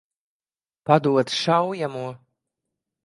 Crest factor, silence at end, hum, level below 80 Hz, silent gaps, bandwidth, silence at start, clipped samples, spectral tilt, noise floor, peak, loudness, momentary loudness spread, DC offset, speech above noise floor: 22 dB; 0.9 s; none; -72 dBFS; none; 11.5 kHz; 0.85 s; under 0.1%; -5.5 dB/octave; under -90 dBFS; -2 dBFS; -21 LUFS; 16 LU; under 0.1%; over 69 dB